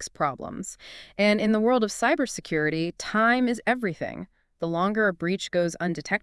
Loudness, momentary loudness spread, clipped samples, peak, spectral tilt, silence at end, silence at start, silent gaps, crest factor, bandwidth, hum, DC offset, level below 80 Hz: -25 LUFS; 14 LU; under 0.1%; -8 dBFS; -5 dB/octave; 0.05 s; 0 s; none; 18 dB; 12 kHz; none; under 0.1%; -58 dBFS